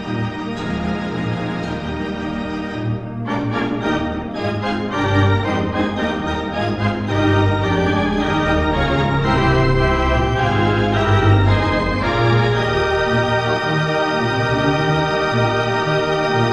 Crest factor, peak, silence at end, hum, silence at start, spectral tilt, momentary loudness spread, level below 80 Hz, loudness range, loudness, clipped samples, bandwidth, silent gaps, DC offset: 16 dB; -2 dBFS; 0 s; none; 0 s; -6.5 dB/octave; 8 LU; -30 dBFS; 7 LU; -18 LUFS; under 0.1%; 10 kHz; none; under 0.1%